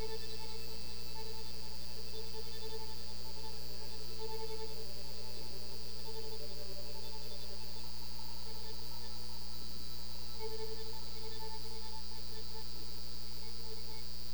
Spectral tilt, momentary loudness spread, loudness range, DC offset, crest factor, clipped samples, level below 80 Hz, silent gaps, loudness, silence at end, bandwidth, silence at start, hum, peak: -3.5 dB/octave; 2 LU; 1 LU; 3%; 16 dB; under 0.1%; -52 dBFS; none; -45 LUFS; 0 s; over 20 kHz; 0 s; none; -26 dBFS